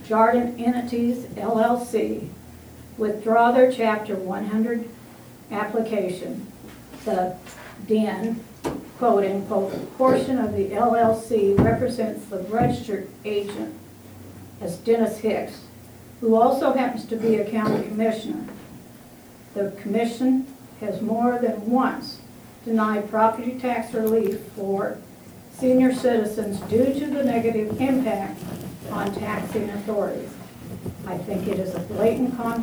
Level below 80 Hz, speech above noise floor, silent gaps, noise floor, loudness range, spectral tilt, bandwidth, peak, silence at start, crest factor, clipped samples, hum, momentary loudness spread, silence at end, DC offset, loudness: -52 dBFS; 23 dB; none; -46 dBFS; 6 LU; -6.5 dB/octave; over 20 kHz; -6 dBFS; 0 s; 18 dB; under 0.1%; none; 19 LU; 0 s; under 0.1%; -23 LUFS